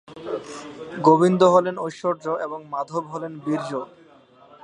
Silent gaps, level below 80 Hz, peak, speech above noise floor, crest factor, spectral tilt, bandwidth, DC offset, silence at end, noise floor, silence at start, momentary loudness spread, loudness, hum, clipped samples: none; -70 dBFS; -2 dBFS; 30 dB; 22 dB; -6.5 dB/octave; 10.5 kHz; under 0.1%; 0.75 s; -51 dBFS; 0.1 s; 17 LU; -22 LUFS; none; under 0.1%